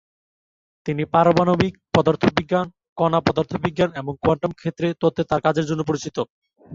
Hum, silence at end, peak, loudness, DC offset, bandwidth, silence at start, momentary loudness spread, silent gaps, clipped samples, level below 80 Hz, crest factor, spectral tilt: none; 0 s; -2 dBFS; -21 LUFS; under 0.1%; 7.6 kHz; 0.85 s; 10 LU; 2.89-2.96 s, 6.30-6.42 s; under 0.1%; -48 dBFS; 20 dB; -6.5 dB/octave